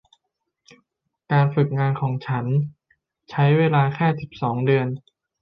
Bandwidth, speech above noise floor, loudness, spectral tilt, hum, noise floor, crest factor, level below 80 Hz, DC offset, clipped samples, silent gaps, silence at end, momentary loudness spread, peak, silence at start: 5.6 kHz; 57 dB; -21 LUFS; -9.5 dB/octave; none; -77 dBFS; 16 dB; -60 dBFS; under 0.1%; under 0.1%; none; 0.4 s; 10 LU; -6 dBFS; 1.3 s